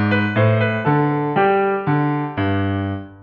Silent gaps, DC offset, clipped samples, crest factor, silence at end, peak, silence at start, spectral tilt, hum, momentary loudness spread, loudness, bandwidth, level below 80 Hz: none; under 0.1%; under 0.1%; 14 dB; 0 s; -4 dBFS; 0 s; -10 dB/octave; none; 5 LU; -18 LUFS; 5.2 kHz; -58 dBFS